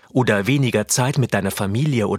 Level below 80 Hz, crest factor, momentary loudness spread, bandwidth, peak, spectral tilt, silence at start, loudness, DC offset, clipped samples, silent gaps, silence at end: -54 dBFS; 16 dB; 3 LU; 16.5 kHz; -4 dBFS; -5 dB/octave; 0.15 s; -19 LUFS; under 0.1%; under 0.1%; none; 0 s